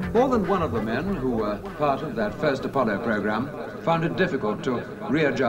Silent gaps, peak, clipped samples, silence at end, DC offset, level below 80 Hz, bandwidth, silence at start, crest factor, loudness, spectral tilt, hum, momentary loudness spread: none; -8 dBFS; under 0.1%; 0 s; under 0.1%; -46 dBFS; 16 kHz; 0 s; 16 dB; -25 LUFS; -7 dB/octave; none; 6 LU